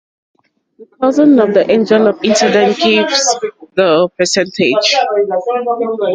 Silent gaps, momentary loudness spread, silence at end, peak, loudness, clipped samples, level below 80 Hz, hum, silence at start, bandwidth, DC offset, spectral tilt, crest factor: none; 7 LU; 0 s; 0 dBFS; -12 LUFS; under 0.1%; -58 dBFS; none; 0.8 s; 9.4 kHz; under 0.1%; -3.5 dB/octave; 12 dB